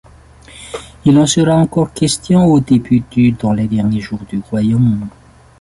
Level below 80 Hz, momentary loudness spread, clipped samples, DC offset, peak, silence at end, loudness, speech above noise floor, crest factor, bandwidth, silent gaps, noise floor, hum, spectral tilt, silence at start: -40 dBFS; 14 LU; under 0.1%; under 0.1%; -2 dBFS; 0.5 s; -13 LUFS; 28 dB; 12 dB; 11.5 kHz; none; -40 dBFS; none; -6 dB/octave; 0.55 s